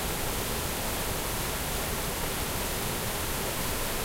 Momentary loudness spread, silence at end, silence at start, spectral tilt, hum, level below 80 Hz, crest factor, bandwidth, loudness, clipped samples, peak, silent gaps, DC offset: 0 LU; 0 s; 0 s; -3 dB/octave; none; -38 dBFS; 14 dB; 16 kHz; -30 LUFS; under 0.1%; -16 dBFS; none; under 0.1%